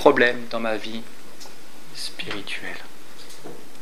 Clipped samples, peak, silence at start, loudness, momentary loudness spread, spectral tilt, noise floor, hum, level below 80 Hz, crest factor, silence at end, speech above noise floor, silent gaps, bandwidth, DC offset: under 0.1%; 0 dBFS; 0 s; -26 LUFS; 23 LU; -3.5 dB/octave; -45 dBFS; none; -72 dBFS; 26 dB; 0 s; 22 dB; none; 16 kHz; 5%